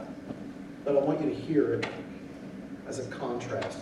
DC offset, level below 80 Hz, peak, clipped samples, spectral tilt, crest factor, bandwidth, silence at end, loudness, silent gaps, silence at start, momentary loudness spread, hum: under 0.1%; -62 dBFS; -12 dBFS; under 0.1%; -6.5 dB/octave; 20 dB; 11.5 kHz; 0 s; -31 LUFS; none; 0 s; 16 LU; none